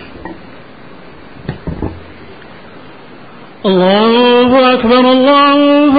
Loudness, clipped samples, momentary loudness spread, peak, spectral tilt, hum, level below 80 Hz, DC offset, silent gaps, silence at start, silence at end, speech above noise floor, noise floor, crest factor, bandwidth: -8 LUFS; under 0.1%; 20 LU; 0 dBFS; -11.5 dB/octave; none; -38 dBFS; 1%; none; 0 s; 0 s; 27 dB; -35 dBFS; 12 dB; 5 kHz